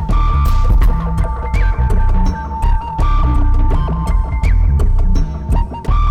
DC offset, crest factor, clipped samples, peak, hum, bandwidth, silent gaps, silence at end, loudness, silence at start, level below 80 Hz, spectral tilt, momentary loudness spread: under 0.1%; 8 dB; under 0.1%; -4 dBFS; none; 8.8 kHz; none; 0 s; -17 LUFS; 0 s; -12 dBFS; -7.5 dB/octave; 4 LU